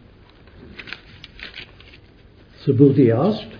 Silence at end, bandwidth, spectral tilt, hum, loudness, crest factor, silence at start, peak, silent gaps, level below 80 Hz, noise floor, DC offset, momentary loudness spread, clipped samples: 0 s; 5.2 kHz; -10 dB/octave; none; -16 LUFS; 20 dB; 0.8 s; 0 dBFS; none; -52 dBFS; -48 dBFS; under 0.1%; 25 LU; under 0.1%